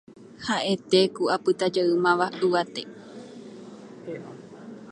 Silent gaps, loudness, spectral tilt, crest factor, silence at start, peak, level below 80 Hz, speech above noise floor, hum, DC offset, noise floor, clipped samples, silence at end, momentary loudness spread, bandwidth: none; -24 LUFS; -5 dB/octave; 20 dB; 0.2 s; -6 dBFS; -70 dBFS; 19 dB; none; under 0.1%; -43 dBFS; under 0.1%; 0 s; 22 LU; 10.5 kHz